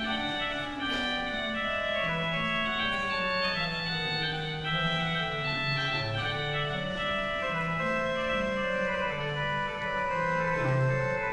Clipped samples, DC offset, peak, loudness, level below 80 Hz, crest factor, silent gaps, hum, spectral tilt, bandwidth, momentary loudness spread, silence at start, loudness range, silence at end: under 0.1%; under 0.1%; -16 dBFS; -29 LUFS; -50 dBFS; 14 dB; none; none; -5.5 dB/octave; 11.5 kHz; 3 LU; 0 s; 1 LU; 0 s